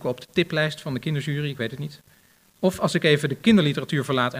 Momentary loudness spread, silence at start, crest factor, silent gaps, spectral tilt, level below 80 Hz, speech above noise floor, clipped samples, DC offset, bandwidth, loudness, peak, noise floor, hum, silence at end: 11 LU; 0 s; 18 dB; none; -6 dB/octave; -58 dBFS; 35 dB; under 0.1%; under 0.1%; 15.5 kHz; -23 LUFS; -6 dBFS; -58 dBFS; none; 0 s